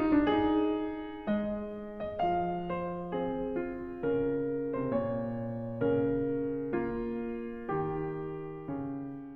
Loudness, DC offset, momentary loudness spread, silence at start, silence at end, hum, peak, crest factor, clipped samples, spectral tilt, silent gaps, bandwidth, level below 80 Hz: -33 LUFS; 0.1%; 10 LU; 0 s; 0 s; none; -16 dBFS; 16 dB; under 0.1%; -10 dB/octave; none; 4.8 kHz; -54 dBFS